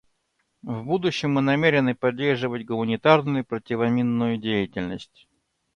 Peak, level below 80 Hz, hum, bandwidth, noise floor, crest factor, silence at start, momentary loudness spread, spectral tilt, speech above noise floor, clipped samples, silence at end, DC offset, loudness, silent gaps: -2 dBFS; -58 dBFS; none; 9 kHz; -73 dBFS; 20 dB; 0.65 s; 13 LU; -7 dB/octave; 50 dB; under 0.1%; 0.7 s; under 0.1%; -23 LUFS; none